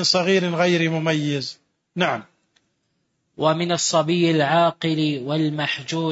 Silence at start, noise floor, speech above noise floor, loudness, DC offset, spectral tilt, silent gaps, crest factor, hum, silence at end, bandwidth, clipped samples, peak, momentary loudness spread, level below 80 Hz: 0 s; -71 dBFS; 51 dB; -21 LUFS; under 0.1%; -4.5 dB/octave; none; 18 dB; none; 0 s; 8 kHz; under 0.1%; -4 dBFS; 7 LU; -68 dBFS